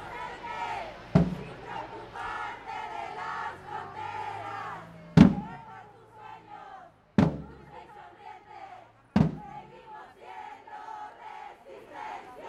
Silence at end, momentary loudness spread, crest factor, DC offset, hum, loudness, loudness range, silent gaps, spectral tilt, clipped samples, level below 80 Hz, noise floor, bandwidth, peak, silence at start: 0 s; 21 LU; 30 dB; under 0.1%; none; -30 LUFS; 9 LU; none; -8 dB/octave; under 0.1%; -50 dBFS; -51 dBFS; 9.2 kHz; -2 dBFS; 0 s